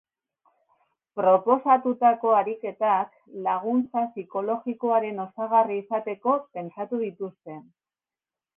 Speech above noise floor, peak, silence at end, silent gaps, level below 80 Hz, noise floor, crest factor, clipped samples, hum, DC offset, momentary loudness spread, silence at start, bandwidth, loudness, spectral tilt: over 66 dB; -6 dBFS; 0.95 s; none; -76 dBFS; under -90 dBFS; 18 dB; under 0.1%; none; under 0.1%; 14 LU; 1.15 s; 3.6 kHz; -25 LUFS; -10 dB/octave